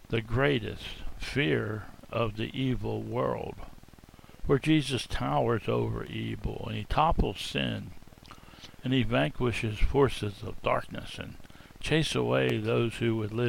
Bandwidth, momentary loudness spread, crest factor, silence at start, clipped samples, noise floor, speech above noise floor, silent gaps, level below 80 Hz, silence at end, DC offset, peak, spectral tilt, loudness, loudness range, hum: 16.5 kHz; 14 LU; 18 dB; 0.1 s; under 0.1%; -52 dBFS; 23 dB; none; -40 dBFS; 0 s; under 0.1%; -10 dBFS; -6 dB/octave; -30 LUFS; 3 LU; none